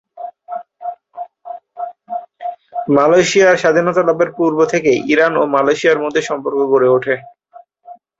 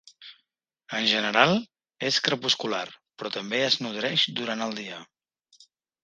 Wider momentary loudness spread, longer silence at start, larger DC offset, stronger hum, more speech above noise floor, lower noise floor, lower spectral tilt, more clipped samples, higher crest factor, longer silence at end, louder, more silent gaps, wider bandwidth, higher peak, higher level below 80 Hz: first, 19 LU vs 16 LU; about the same, 0.15 s vs 0.2 s; neither; neither; second, 31 dB vs 50 dB; second, -44 dBFS vs -76 dBFS; first, -4.5 dB/octave vs -3 dB/octave; neither; second, 14 dB vs 28 dB; second, 0.25 s vs 1 s; first, -14 LUFS vs -25 LUFS; neither; second, 8 kHz vs 10 kHz; about the same, 0 dBFS vs -2 dBFS; first, -58 dBFS vs -70 dBFS